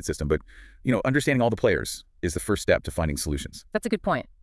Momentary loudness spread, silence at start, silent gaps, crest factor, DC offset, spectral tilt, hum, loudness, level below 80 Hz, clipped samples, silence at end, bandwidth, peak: 9 LU; 0 s; none; 20 dB; under 0.1%; -5 dB/octave; none; -26 LUFS; -42 dBFS; under 0.1%; 0.2 s; 12 kHz; -6 dBFS